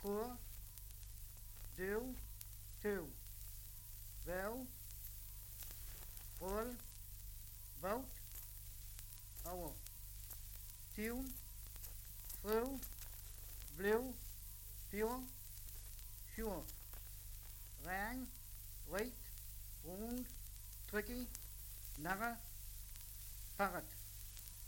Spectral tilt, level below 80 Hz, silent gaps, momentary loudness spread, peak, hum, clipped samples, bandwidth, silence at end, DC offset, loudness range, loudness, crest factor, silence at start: -4 dB/octave; -56 dBFS; none; 11 LU; -22 dBFS; 50 Hz at -60 dBFS; under 0.1%; 17 kHz; 0 s; under 0.1%; 5 LU; -48 LUFS; 26 dB; 0 s